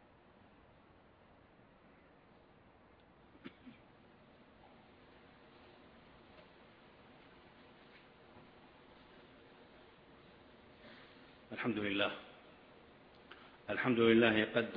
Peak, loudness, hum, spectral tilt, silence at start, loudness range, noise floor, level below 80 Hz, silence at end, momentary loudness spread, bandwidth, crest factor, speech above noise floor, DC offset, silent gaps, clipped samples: -16 dBFS; -34 LUFS; none; -3.5 dB/octave; 3.45 s; 23 LU; -64 dBFS; -74 dBFS; 0 s; 29 LU; 5.2 kHz; 26 dB; 32 dB; under 0.1%; none; under 0.1%